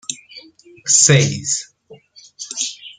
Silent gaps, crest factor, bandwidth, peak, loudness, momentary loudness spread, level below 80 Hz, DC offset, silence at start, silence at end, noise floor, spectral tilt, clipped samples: none; 20 dB; 9.8 kHz; 0 dBFS; -14 LUFS; 20 LU; -54 dBFS; under 0.1%; 0.1 s; 0.05 s; -45 dBFS; -2.5 dB/octave; under 0.1%